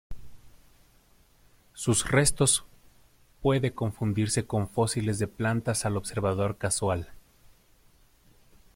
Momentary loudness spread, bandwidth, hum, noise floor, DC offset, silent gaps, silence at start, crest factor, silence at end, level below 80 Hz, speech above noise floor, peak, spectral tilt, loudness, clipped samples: 7 LU; 16.5 kHz; none; -60 dBFS; under 0.1%; none; 0.1 s; 22 dB; 1.55 s; -50 dBFS; 34 dB; -8 dBFS; -4.5 dB/octave; -27 LUFS; under 0.1%